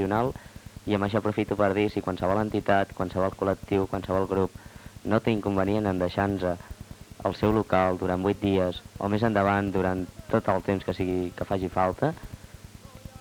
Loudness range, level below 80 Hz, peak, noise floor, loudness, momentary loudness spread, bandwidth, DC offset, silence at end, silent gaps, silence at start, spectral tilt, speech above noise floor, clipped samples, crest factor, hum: 2 LU; -48 dBFS; -8 dBFS; -46 dBFS; -27 LUFS; 19 LU; 18.5 kHz; under 0.1%; 0 s; none; 0 s; -7.5 dB/octave; 20 dB; under 0.1%; 18 dB; none